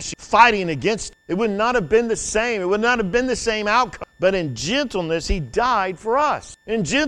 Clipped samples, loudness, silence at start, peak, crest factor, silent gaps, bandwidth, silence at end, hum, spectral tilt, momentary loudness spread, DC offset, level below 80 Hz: under 0.1%; -20 LUFS; 0 s; 0 dBFS; 20 dB; none; 11.5 kHz; 0 s; none; -4 dB/octave; 8 LU; under 0.1%; -38 dBFS